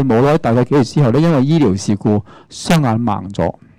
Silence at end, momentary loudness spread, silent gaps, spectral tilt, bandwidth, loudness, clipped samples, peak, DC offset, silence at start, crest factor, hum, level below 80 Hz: 0.3 s; 8 LU; none; -7 dB/octave; 15.5 kHz; -14 LUFS; under 0.1%; -6 dBFS; under 0.1%; 0 s; 8 dB; none; -42 dBFS